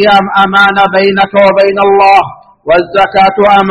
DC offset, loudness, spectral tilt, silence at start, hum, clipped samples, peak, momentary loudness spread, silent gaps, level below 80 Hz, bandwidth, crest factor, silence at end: under 0.1%; -7 LUFS; -6 dB/octave; 0 s; none; 1%; 0 dBFS; 4 LU; none; -42 dBFS; 9.6 kHz; 6 dB; 0 s